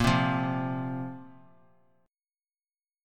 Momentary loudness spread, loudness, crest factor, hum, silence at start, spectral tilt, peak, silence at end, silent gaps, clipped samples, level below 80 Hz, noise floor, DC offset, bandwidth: 15 LU; -30 LUFS; 20 dB; none; 0 s; -6 dB/octave; -12 dBFS; 1.75 s; none; under 0.1%; -48 dBFS; under -90 dBFS; under 0.1%; 14.5 kHz